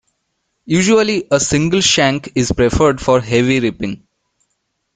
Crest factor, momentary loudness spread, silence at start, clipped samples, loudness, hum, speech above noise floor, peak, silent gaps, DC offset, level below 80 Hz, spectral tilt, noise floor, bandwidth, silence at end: 16 dB; 7 LU; 0.65 s; under 0.1%; -14 LUFS; none; 56 dB; 0 dBFS; none; under 0.1%; -36 dBFS; -4 dB/octave; -70 dBFS; 9.6 kHz; 1 s